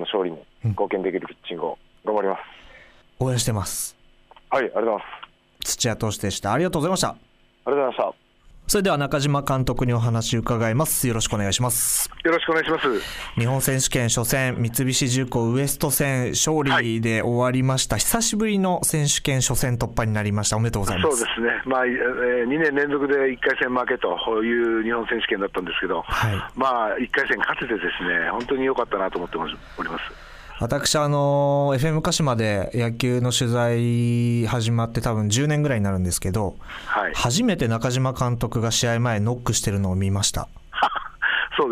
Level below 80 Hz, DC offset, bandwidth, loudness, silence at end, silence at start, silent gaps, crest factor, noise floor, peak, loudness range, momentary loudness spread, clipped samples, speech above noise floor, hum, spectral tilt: -42 dBFS; under 0.1%; 16 kHz; -22 LUFS; 0 s; 0 s; none; 16 dB; -52 dBFS; -6 dBFS; 4 LU; 7 LU; under 0.1%; 30 dB; none; -4 dB/octave